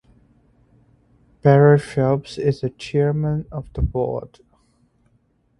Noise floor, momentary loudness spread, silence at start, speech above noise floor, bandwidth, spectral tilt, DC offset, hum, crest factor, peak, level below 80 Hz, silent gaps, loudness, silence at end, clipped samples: -63 dBFS; 13 LU; 1.45 s; 44 dB; 11 kHz; -8.5 dB/octave; under 0.1%; none; 20 dB; 0 dBFS; -38 dBFS; none; -20 LUFS; 1.35 s; under 0.1%